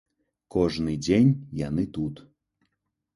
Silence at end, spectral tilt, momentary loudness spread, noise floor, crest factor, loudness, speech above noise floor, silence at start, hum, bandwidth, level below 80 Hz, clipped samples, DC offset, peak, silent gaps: 1 s; -7 dB/octave; 11 LU; -79 dBFS; 18 dB; -26 LUFS; 54 dB; 0.55 s; none; 11.5 kHz; -48 dBFS; under 0.1%; under 0.1%; -8 dBFS; none